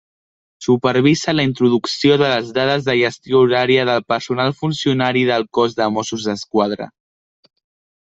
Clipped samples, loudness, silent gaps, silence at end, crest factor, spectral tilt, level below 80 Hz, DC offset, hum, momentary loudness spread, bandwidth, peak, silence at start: under 0.1%; -17 LUFS; none; 1.15 s; 16 dB; -5.5 dB/octave; -56 dBFS; under 0.1%; none; 7 LU; 8 kHz; -2 dBFS; 0.6 s